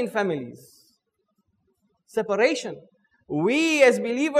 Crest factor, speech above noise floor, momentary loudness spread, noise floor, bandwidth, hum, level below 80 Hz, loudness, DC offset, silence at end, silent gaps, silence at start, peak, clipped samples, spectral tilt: 20 dB; 51 dB; 17 LU; -74 dBFS; 14.5 kHz; none; -72 dBFS; -22 LUFS; under 0.1%; 0 s; none; 0 s; -4 dBFS; under 0.1%; -4.5 dB/octave